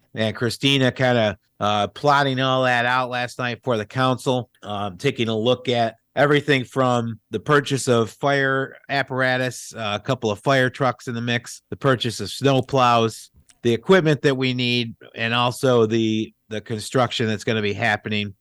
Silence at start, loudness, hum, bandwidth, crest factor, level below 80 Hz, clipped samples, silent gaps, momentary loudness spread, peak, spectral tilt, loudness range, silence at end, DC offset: 0.15 s; -21 LUFS; none; 12.5 kHz; 16 dB; -60 dBFS; under 0.1%; none; 8 LU; -6 dBFS; -5 dB/octave; 3 LU; 0.1 s; under 0.1%